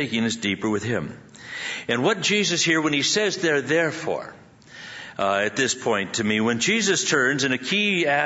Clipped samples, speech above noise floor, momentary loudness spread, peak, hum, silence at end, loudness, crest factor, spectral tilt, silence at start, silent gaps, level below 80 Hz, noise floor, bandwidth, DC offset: under 0.1%; 21 dB; 14 LU; -6 dBFS; none; 0 s; -22 LUFS; 18 dB; -3 dB/octave; 0 s; none; -64 dBFS; -44 dBFS; 8 kHz; under 0.1%